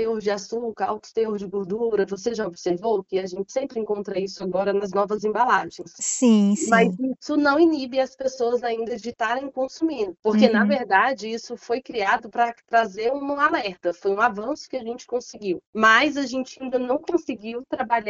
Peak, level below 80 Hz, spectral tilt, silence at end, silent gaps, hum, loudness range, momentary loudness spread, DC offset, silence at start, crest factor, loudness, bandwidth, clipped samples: -2 dBFS; -64 dBFS; -3.5 dB/octave; 0 s; 10.19-10.23 s, 15.67-15.73 s; none; 5 LU; 12 LU; under 0.1%; 0 s; 22 dB; -23 LUFS; 8 kHz; under 0.1%